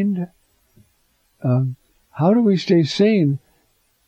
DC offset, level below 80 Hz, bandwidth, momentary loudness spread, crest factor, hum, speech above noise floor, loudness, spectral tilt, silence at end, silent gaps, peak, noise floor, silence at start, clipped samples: under 0.1%; -64 dBFS; 8.4 kHz; 15 LU; 16 dB; none; 46 dB; -19 LUFS; -7.5 dB/octave; 0.7 s; none; -4 dBFS; -63 dBFS; 0 s; under 0.1%